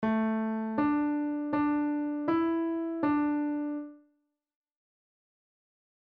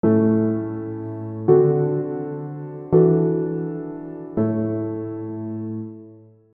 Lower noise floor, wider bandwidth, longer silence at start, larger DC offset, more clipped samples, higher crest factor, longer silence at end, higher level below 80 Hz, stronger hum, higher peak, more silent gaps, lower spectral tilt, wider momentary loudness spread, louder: first, -76 dBFS vs -46 dBFS; first, 4.5 kHz vs 2.6 kHz; about the same, 0 s vs 0.05 s; neither; neither; about the same, 14 dB vs 18 dB; first, 2.1 s vs 0.35 s; second, -66 dBFS vs -58 dBFS; neither; second, -16 dBFS vs -4 dBFS; neither; second, -6 dB/octave vs -14 dB/octave; second, 5 LU vs 16 LU; second, -30 LUFS vs -22 LUFS